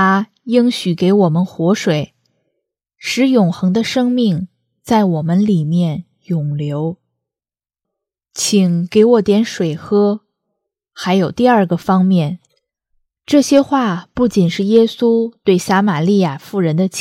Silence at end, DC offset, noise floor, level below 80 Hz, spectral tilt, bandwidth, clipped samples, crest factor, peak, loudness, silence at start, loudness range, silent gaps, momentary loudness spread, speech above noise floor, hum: 0 s; under 0.1%; under -90 dBFS; -54 dBFS; -6 dB/octave; 15 kHz; under 0.1%; 14 dB; 0 dBFS; -15 LUFS; 0 s; 4 LU; none; 8 LU; over 76 dB; none